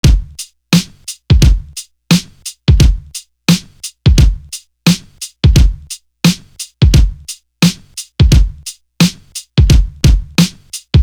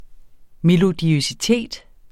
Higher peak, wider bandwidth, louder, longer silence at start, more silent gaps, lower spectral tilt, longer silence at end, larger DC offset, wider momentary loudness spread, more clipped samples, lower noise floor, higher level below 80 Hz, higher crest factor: first, 0 dBFS vs -4 dBFS; first, over 20 kHz vs 14 kHz; first, -13 LUFS vs -18 LUFS; about the same, 0.05 s vs 0 s; neither; about the same, -5 dB/octave vs -5.5 dB/octave; second, 0 s vs 0.35 s; neither; first, 18 LU vs 12 LU; neither; second, -32 dBFS vs -41 dBFS; first, -16 dBFS vs -46 dBFS; about the same, 12 dB vs 16 dB